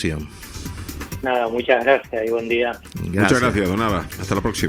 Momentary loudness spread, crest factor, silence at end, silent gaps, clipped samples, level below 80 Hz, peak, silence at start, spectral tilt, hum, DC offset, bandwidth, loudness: 15 LU; 20 dB; 0 s; none; under 0.1%; -40 dBFS; 0 dBFS; 0 s; -5.5 dB/octave; none; under 0.1%; 20 kHz; -20 LUFS